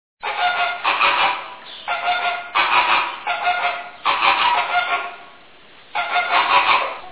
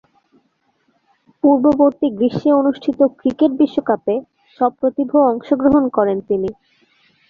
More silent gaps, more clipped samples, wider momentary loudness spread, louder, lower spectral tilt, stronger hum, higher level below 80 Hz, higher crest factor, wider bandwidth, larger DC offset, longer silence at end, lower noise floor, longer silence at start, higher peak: neither; neither; first, 11 LU vs 6 LU; about the same, -18 LUFS vs -16 LUFS; second, -4.5 dB/octave vs -9 dB/octave; neither; second, -60 dBFS vs -52 dBFS; about the same, 18 dB vs 16 dB; second, 4 kHz vs 5 kHz; first, 0.3% vs under 0.1%; second, 0 s vs 0.75 s; second, -46 dBFS vs -64 dBFS; second, 0.25 s vs 1.45 s; about the same, -2 dBFS vs -2 dBFS